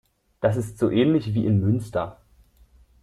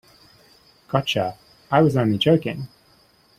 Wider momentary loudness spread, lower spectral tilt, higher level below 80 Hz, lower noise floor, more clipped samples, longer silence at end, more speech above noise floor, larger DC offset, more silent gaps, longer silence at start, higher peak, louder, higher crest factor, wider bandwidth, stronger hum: second, 9 LU vs 13 LU; first, -8 dB/octave vs -6.5 dB/octave; about the same, -52 dBFS vs -56 dBFS; about the same, -56 dBFS vs -57 dBFS; neither; first, 0.9 s vs 0.7 s; about the same, 34 dB vs 37 dB; neither; neither; second, 0.4 s vs 0.9 s; second, -8 dBFS vs -2 dBFS; about the same, -23 LUFS vs -21 LUFS; about the same, 16 dB vs 20 dB; second, 12.5 kHz vs 15 kHz; neither